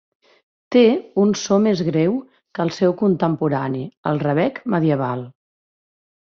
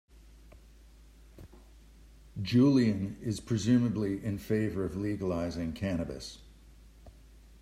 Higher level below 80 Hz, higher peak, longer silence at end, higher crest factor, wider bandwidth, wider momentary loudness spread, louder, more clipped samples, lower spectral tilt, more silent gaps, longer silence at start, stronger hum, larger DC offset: second, -60 dBFS vs -54 dBFS; first, -4 dBFS vs -14 dBFS; first, 1.1 s vs 0.5 s; about the same, 16 dB vs 18 dB; second, 7.4 kHz vs 15 kHz; second, 10 LU vs 15 LU; first, -19 LUFS vs -30 LUFS; neither; about the same, -6.5 dB/octave vs -7 dB/octave; first, 3.97-4.03 s vs none; first, 0.7 s vs 0.15 s; neither; neither